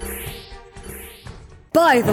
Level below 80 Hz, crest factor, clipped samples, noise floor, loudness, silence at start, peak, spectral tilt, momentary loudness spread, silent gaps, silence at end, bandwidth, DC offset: -42 dBFS; 18 dB; under 0.1%; -40 dBFS; -18 LUFS; 0 s; -4 dBFS; -4.5 dB/octave; 25 LU; none; 0 s; 19 kHz; under 0.1%